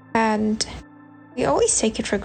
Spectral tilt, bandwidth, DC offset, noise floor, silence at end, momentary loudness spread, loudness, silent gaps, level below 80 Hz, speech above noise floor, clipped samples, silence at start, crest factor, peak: -3 dB/octave; 9.4 kHz; under 0.1%; -46 dBFS; 0 s; 13 LU; -21 LUFS; none; -46 dBFS; 24 dB; under 0.1%; 0.15 s; 18 dB; -4 dBFS